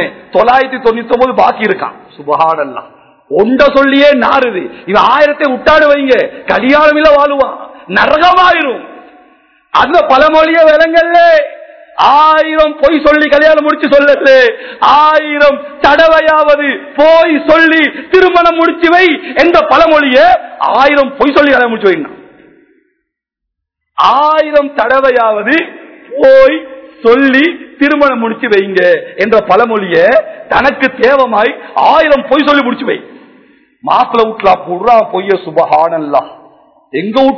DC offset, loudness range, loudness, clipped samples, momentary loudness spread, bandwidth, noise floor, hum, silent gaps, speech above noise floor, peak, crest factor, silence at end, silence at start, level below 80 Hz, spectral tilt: 0.2%; 4 LU; -8 LUFS; 5%; 8 LU; 5.4 kHz; -76 dBFS; none; none; 68 dB; 0 dBFS; 8 dB; 0 s; 0 s; -40 dBFS; -5.5 dB/octave